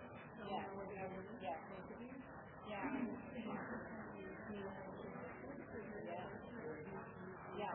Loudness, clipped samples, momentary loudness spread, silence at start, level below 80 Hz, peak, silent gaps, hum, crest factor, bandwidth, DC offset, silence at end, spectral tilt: -50 LUFS; under 0.1%; 7 LU; 0 s; -72 dBFS; -32 dBFS; none; none; 18 dB; 3.5 kHz; under 0.1%; 0 s; -3 dB/octave